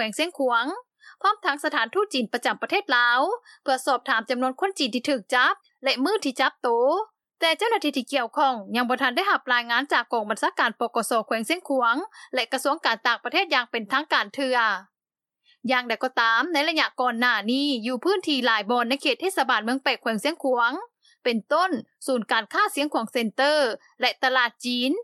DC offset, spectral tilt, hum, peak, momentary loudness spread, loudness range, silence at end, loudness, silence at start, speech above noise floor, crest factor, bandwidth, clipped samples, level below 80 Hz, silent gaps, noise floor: under 0.1%; -2.5 dB/octave; none; -4 dBFS; 5 LU; 2 LU; 0 s; -23 LUFS; 0 s; over 66 dB; 20 dB; 14 kHz; under 0.1%; under -90 dBFS; none; under -90 dBFS